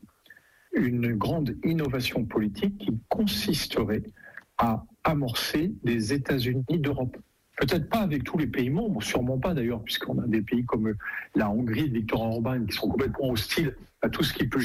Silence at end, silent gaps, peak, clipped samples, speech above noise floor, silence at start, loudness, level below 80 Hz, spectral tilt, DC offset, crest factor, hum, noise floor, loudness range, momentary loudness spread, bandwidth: 0 s; none; -14 dBFS; under 0.1%; 29 dB; 0.3 s; -28 LUFS; -48 dBFS; -6 dB/octave; under 0.1%; 12 dB; none; -56 dBFS; 1 LU; 4 LU; 16 kHz